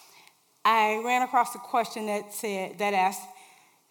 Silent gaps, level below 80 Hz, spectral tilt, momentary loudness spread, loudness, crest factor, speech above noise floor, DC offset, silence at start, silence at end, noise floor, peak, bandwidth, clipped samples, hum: none; under -90 dBFS; -3 dB/octave; 9 LU; -27 LUFS; 20 dB; 32 dB; under 0.1%; 0.65 s; 0.6 s; -59 dBFS; -8 dBFS; 18 kHz; under 0.1%; none